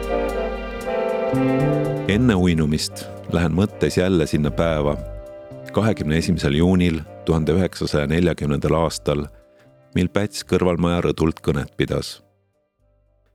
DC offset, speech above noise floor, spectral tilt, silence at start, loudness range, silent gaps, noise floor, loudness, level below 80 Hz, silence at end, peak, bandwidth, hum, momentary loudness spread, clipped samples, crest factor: under 0.1%; 46 dB; -6.5 dB/octave; 0 s; 3 LU; none; -66 dBFS; -21 LUFS; -36 dBFS; 1.15 s; 0 dBFS; 15 kHz; none; 9 LU; under 0.1%; 20 dB